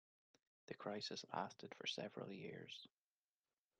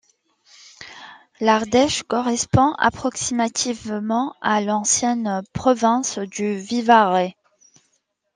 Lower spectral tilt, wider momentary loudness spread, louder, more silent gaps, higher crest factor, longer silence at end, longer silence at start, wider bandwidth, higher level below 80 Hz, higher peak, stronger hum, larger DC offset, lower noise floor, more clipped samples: about the same, -4 dB/octave vs -3.5 dB/octave; about the same, 10 LU vs 10 LU; second, -50 LUFS vs -20 LUFS; neither; about the same, 24 dB vs 20 dB; about the same, 0.95 s vs 1.05 s; about the same, 0.7 s vs 0.8 s; about the same, 10.5 kHz vs 10.5 kHz; second, under -90 dBFS vs -52 dBFS; second, -28 dBFS vs -2 dBFS; neither; neither; first, under -90 dBFS vs -69 dBFS; neither